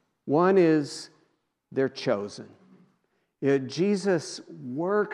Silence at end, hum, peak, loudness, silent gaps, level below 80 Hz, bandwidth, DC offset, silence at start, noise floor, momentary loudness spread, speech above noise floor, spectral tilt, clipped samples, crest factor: 0 s; none; -10 dBFS; -26 LUFS; none; -82 dBFS; 11 kHz; under 0.1%; 0.25 s; -73 dBFS; 18 LU; 48 dB; -6 dB/octave; under 0.1%; 18 dB